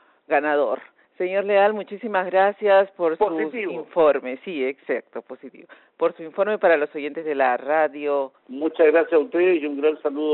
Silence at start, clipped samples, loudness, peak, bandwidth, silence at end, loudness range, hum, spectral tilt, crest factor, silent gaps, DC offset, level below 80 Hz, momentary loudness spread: 0.3 s; under 0.1%; -22 LUFS; -6 dBFS; 4.2 kHz; 0 s; 4 LU; none; -2.5 dB/octave; 16 dB; none; under 0.1%; -72 dBFS; 11 LU